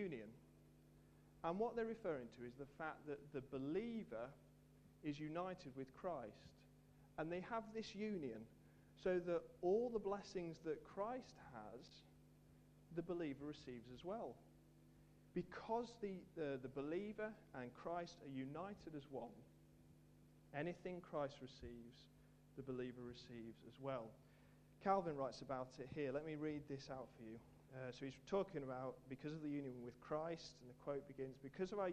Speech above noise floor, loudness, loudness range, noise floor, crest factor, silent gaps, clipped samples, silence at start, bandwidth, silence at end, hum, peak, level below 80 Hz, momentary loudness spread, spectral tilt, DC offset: 21 dB; -49 LUFS; 7 LU; -69 dBFS; 24 dB; none; under 0.1%; 0 s; 13.5 kHz; 0 s; 50 Hz at -70 dBFS; -26 dBFS; -74 dBFS; 24 LU; -7 dB/octave; under 0.1%